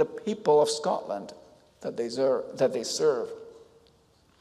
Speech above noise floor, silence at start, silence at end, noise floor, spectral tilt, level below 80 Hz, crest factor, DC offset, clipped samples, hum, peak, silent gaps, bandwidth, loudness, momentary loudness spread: 36 dB; 0 s; 0.75 s; -62 dBFS; -4 dB/octave; -72 dBFS; 16 dB; under 0.1%; under 0.1%; none; -12 dBFS; none; 13.5 kHz; -27 LUFS; 15 LU